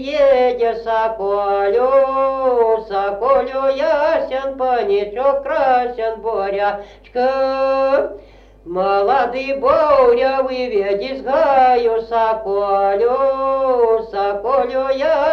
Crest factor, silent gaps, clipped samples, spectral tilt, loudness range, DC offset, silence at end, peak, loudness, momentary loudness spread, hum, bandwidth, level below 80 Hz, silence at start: 14 dB; none; under 0.1%; -5.5 dB/octave; 3 LU; under 0.1%; 0 s; -2 dBFS; -16 LUFS; 7 LU; none; 6.4 kHz; -46 dBFS; 0 s